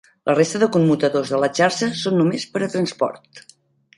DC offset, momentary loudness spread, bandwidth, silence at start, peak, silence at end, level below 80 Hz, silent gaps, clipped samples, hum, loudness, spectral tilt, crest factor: under 0.1%; 7 LU; 11.5 kHz; 0.25 s; -4 dBFS; 0.6 s; -64 dBFS; none; under 0.1%; none; -19 LUFS; -5.5 dB/octave; 16 dB